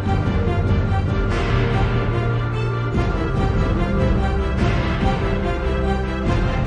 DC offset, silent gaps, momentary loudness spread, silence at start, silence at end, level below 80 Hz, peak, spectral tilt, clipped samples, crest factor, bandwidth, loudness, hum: under 0.1%; none; 2 LU; 0 s; 0 s; -24 dBFS; -4 dBFS; -8 dB/octave; under 0.1%; 14 dB; 9.2 kHz; -21 LUFS; none